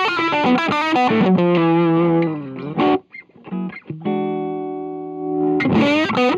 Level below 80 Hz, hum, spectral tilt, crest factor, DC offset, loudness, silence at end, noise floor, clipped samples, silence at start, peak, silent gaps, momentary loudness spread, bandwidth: -56 dBFS; none; -7 dB/octave; 14 dB; under 0.1%; -18 LUFS; 0 s; -41 dBFS; under 0.1%; 0 s; -4 dBFS; none; 12 LU; 7.8 kHz